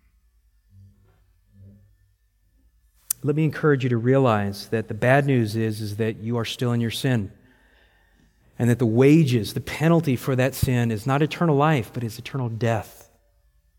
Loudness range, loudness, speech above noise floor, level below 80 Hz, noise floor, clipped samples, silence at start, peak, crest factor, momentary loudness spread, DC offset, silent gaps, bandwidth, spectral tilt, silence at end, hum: 6 LU; -22 LUFS; 42 dB; -50 dBFS; -64 dBFS; under 0.1%; 1.6 s; -2 dBFS; 20 dB; 10 LU; under 0.1%; none; 17 kHz; -6.5 dB/octave; 0.9 s; none